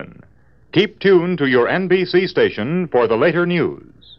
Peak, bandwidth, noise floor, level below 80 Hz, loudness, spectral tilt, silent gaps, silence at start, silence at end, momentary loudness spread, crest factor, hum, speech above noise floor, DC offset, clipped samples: -2 dBFS; 6 kHz; -52 dBFS; -56 dBFS; -17 LUFS; -8.5 dB/octave; none; 0 s; 0.4 s; 6 LU; 16 dB; none; 36 dB; 0.2%; under 0.1%